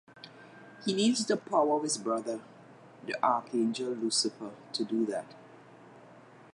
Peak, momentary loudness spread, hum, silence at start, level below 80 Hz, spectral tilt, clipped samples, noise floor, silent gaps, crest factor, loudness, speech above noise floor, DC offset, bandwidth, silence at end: -12 dBFS; 22 LU; none; 0.15 s; -84 dBFS; -3.5 dB/octave; under 0.1%; -54 dBFS; none; 20 dB; -31 LUFS; 24 dB; under 0.1%; 11.5 kHz; 0.35 s